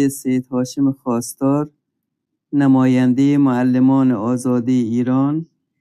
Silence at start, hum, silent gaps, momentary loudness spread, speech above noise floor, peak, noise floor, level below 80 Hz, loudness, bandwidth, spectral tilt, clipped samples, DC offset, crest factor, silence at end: 0 s; none; none; 8 LU; 61 dB; -4 dBFS; -76 dBFS; -62 dBFS; -17 LUFS; 13 kHz; -7 dB/octave; under 0.1%; under 0.1%; 12 dB; 0.35 s